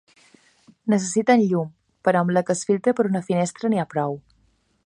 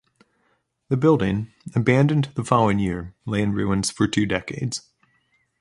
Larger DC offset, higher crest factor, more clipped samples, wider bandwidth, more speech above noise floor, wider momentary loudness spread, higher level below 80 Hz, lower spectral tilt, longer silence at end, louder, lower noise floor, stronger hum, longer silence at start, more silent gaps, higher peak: neither; about the same, 18 dB vs 22 dB; neither; about the same, 11 kHz vs 11.5 kHz; second, 43 dB vs 47 dB; about the same, 9 LU vs 10 LU; second, -68 dBFS vs -48 dBFS; about the same, -6 dB/octave vs -6 dB/octave; second, 0.65 s vs 0.8 s; about the same, -22 LUFS vs -22 LUFS; second, -64 dBFS vs -68 dBFS; neither; about the same, 0.85 s vs 0.9 s; neither; about the same, -4 dBFS vs -2 dBFS